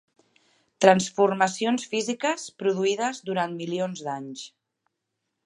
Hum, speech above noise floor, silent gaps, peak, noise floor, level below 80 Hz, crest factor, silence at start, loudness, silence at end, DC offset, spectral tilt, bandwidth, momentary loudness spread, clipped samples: none; 56 dB; none; -2 dBFS; -81 dBFS; -76 dBFS; 24 dB; 0.8 s; -25 LUFS; 1 s; under 0.1%; -4 dB/octave; 11.5 kHz; 14 LU; under 0.1%